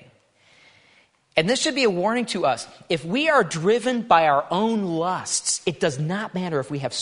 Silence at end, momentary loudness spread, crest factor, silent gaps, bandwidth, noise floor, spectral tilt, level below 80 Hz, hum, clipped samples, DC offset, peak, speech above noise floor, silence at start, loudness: 0 s; 8 LU; 22 dB; none; 11 kHz; -59 dBFS; -3.5 dB/octave; -64 dBFS; none; under 0.1%; under 0.1%; -2 dBFS; 37 dB; 1.35 s; -22 LUFS